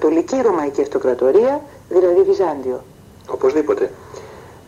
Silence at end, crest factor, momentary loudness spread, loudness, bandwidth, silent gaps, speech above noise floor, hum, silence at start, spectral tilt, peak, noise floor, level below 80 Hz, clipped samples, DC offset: 0.15 s; 14 dB; 15 LU; -17 LUFS; 8.6 kHz; none; 21 dB; none; 0 s; -6 dB/octave; -4 dBFS; -37 dBFS; -54 dBFS; under 0.1%; under 0.1%